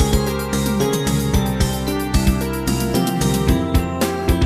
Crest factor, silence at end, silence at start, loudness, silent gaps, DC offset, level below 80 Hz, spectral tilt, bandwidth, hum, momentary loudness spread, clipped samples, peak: 16 dB; 0 s; 0 s; -19 LUFS; none; under 0.1%; -24 dBFS; -5.5 dB/octave; 15.5 kHz; none; 3 LU; under 0.1%; -2 dBFS